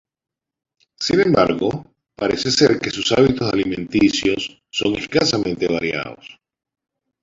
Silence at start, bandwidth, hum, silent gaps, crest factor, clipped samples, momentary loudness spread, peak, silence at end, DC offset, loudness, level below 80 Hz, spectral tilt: 1 s; 7.8 kHz; none; none; 18 dB; under 0.1%; 10 LU; -2 dBFS; 0.9 s; under 0.1%; -18 LUFS; -48 dBFS; -4.5 dB/octave